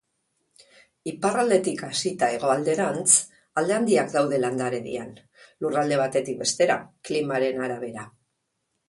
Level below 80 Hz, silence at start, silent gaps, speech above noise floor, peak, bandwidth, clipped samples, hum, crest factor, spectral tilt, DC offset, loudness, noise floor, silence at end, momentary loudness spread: -68 dBFS; 1.05 s; none; 53 dB; -4 dBFS; 11.5 kHz; under 0.1%; none; 22 dB; -3.5 dB/octave; under 0.1%; -24 LUFS; -77 dBFS; 0.8 s; 13 LU